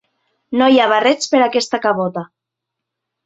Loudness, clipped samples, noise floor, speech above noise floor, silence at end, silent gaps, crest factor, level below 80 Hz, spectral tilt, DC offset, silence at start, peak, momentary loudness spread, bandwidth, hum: -15 LUFS; under 0.1%; -81 dBFS; 66 dB; 1 s; none; 16 dB; -66 dBFS; -4 dB/octave; under 0.1%; 0.5 s; 0 dBFS; 11 LU; 8 kHz; none